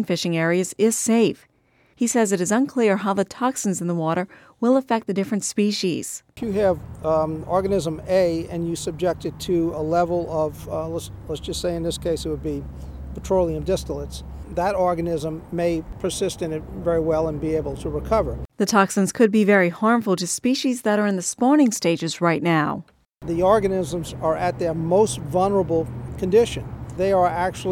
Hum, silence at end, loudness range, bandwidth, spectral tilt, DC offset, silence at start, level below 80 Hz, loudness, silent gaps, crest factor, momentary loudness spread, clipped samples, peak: none; 0 s; 5 LU; 17 kHz; -5 dB/octave; under 0.1%; 0 s; -42 dBFS; -22 LUFS; none; 18 dB; 10 LU; under 0.1%; -4 dBFS